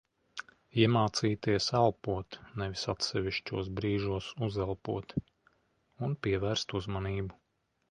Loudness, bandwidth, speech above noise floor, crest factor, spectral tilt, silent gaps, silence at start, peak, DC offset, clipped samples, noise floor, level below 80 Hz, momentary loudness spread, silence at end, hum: -33 LUFS; 10.5 kHz; 46 dB; 22 dB; -5.5 dB/octave; none; 0.35 s; -10 dBFS; under 0.1%; under 0.1%; -78 dBFS; -54 dBFS; 12 LU; 0.6 s; none